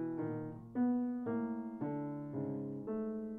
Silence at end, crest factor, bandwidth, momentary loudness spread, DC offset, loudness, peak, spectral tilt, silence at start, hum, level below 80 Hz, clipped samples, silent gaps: 0 s; 14 dB; 2.8 kHz; 7 LU; under 0.1%; -39 LUFS; -26 dBFS; -11.5 dB/octave; 0 s; none; -72 dBFS; under 0.1%; none